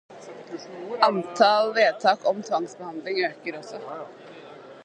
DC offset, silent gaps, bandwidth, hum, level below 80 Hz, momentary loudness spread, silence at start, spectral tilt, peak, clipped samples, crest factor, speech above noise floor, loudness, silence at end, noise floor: under 0.1%; none; 9.4 kHz; none; -78 dBFS; 23 LU; 0.1 s; -4 dB/octave; -2 dBFS; under 0.1%; 22 dB; 20 dB; -23 LUFS; 0.05 s; -44 dBFS